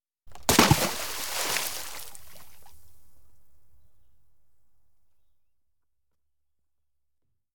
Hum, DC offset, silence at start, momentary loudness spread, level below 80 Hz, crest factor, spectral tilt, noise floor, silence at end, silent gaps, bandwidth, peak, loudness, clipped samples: none; under 0.1%; 0 s; 21 LU; -52 dBFS; 28 dB; -3 dB/octave; -86 dBFS; 0 s; none; 19 kHz; -4 dBFS; -25 LUFS; under 0.1%